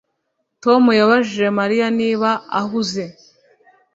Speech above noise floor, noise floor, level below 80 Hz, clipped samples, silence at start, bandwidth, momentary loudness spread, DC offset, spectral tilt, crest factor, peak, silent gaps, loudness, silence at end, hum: 56 dB; -72 dBFS; -62 dBFS; under 0.1%; 0.65 s; 7.8 kHz; 11 LU; under 0.1%; -5 dB/octave; 16 dB; -2 dBFS; none; -17 LUFS; 0.85 s; none